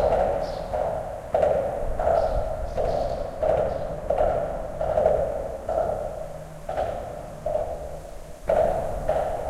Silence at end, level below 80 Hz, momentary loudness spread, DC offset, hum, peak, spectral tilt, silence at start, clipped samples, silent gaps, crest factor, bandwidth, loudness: 0 s; -36 dBFS; 12 LU; under 0.1%; none; -8 dBFS; -6.5 dB/octave; 0 s; under 0.1%; none; 18 dB; 14 kHz; -26 LUFS